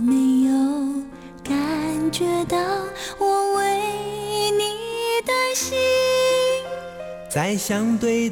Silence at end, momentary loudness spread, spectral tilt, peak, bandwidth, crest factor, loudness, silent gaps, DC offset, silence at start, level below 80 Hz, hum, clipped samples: 0 s; 10 LU; -4 dB/octave; -10 dBFS; 17.5 kHz; 12 dB; -21 LUFS; none; under 0.1%; 0 s; -52 dBFS; none; under 0.1%